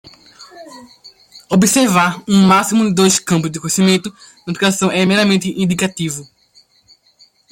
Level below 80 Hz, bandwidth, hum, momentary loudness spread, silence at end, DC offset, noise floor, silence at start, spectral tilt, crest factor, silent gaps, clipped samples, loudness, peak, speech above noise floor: -54 dBFS; 16.5 kHz; none; 12 LU; 1.3 s; under 0.1%; -52 dBFS; 0.05 s; -4.5 dB/octave; 14 dB; none; under 0.1%; -14 LUFS; 0 dBFS; 38 dB